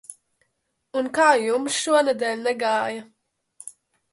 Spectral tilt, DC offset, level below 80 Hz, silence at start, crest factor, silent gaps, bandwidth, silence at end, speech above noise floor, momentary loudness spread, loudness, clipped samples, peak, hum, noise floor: -2 dB/octave; under 0.1%; -74 dBFS; 0.1 s; 20 dB; none; 11.5 kHz; 0.45 s; 53 dB; 23 LU; -22 LUFS; under 0.1%; -4 dBFS; none; -75 dBFS